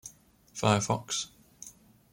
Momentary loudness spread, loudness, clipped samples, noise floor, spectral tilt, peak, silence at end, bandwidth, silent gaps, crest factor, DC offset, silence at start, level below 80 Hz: 21 LU; -29 LUFS; under 0.1%; -57 dBFS; -4 dB/octave; -8 dBFS; 0.45 s; 16.5 kHz; none; 24 dB; under 0.1%; 0.05 s; -64 dBFS